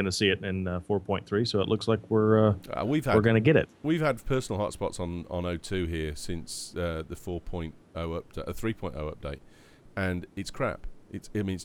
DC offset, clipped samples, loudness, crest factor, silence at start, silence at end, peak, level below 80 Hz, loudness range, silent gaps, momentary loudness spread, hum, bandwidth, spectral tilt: under 0.1%; under 0.1%; -29 LUFS; 20 dB; 0 s; 0 s; -8 dBFS; -46 dBFS; 10 LU; none; 15 LU; none; 16.5 kHz; -6 dB/octave